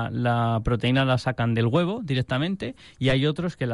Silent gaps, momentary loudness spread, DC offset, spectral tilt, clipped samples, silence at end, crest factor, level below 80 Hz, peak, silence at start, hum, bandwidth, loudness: none; 6 LU; under 0.1%; -7.5 dB/octave; under 0.1%; 0 s; 14 dB; -44 dBFS; -8 dBFS; 0 s; none; 11 kHz; -24 LUFS